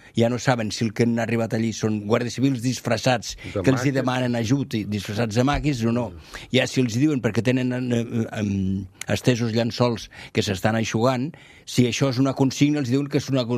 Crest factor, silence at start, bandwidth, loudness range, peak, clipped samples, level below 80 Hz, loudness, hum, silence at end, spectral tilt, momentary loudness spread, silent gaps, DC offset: 20 dB; 0.05 s; 14.5 kHz; 1 LU; -2 dBFS; under 0.1%; -48 dBFS; -23 LUFS; none; 0 s; -5.5 dB/octave; 6 LU; none; under 0.1%